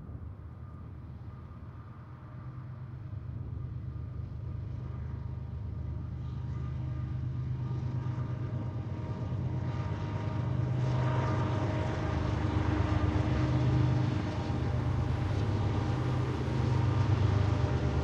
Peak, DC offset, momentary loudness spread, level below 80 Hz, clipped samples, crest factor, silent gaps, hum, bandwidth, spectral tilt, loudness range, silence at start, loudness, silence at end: -16 dBFS; under 0.1%; 16 LU; -42 dBFS; under 0.1%; 16 dB; none; none; 7.6 kHz; -8 dB/octave; 12 LU; 0 s; -33 LUFS; 0 s